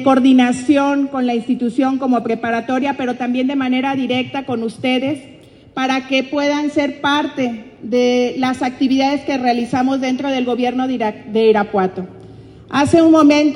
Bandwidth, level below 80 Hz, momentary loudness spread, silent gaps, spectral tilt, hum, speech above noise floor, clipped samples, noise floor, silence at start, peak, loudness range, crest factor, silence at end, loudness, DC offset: 11 kHz; -56 dBFS; 10 LU; none; -5 dB/octave; none; 23 dB; under 0.1%; -38 dBFS; 0 s; 0 dBFS; 3 LU; 16 dB; 0 s; -16 LUFS; under 0.1%